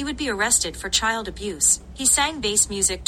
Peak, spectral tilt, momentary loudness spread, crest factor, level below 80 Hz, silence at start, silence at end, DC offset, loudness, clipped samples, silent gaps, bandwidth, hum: -6 dBFS; -0.5 dB/octave; 7 LU; 18 dB; -40 dBFS; 0 s; 0 s; under 0.1%; -20 LUFS; under 0.1%; none; 16 kHz; none